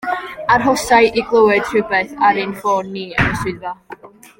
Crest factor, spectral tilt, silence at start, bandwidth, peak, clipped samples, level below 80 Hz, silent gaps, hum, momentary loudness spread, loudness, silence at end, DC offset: 16 dB; -4.5 dB/octave; 0 s; 16.5 kHz; 0 dBFS; under 0.1%; -42 dBFS; none; none; 11 LU; -16 LUFS; 0.3 s; under 0.1%